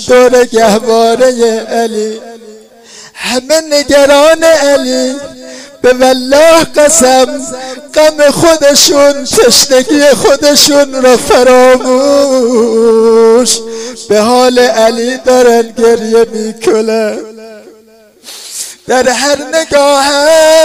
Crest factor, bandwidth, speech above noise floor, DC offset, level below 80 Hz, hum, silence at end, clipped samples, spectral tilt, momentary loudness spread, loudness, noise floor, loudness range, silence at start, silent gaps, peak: 8 dB; 16.5 kHz; 34 dB; under 0.1%; -40 dBFS; none; 0 s; 1%; -2 dB/octave; 13 LU; -7 LUFS; -41 dBFS; 6 LU; 0 s; none; 0 dBFS